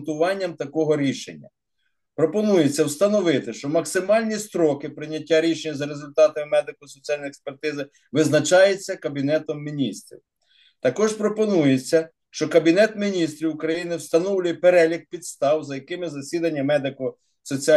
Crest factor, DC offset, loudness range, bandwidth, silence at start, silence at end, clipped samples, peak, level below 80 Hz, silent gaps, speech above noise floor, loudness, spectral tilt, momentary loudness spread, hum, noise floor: 18 dB; under 0.1%; 3 LU; 12.5 kHz; 0 s; 0 s; under 0.1%; -4 dBFS; -72 dBFS; none; 54 dB; -22 LUFS; -5 dB/octave; 13 LU; none; -76 dBFS